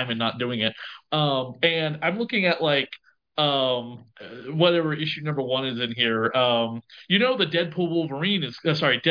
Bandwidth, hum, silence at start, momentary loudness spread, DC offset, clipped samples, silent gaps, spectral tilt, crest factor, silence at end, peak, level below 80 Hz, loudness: 5.2 kHz; none; 0 s; 12 LU; under 0.1%; under 0.1%; none; -7 dB/octave; 20 dB; 0 s; -4 dBFS; -72 dBFS; -23 LUFS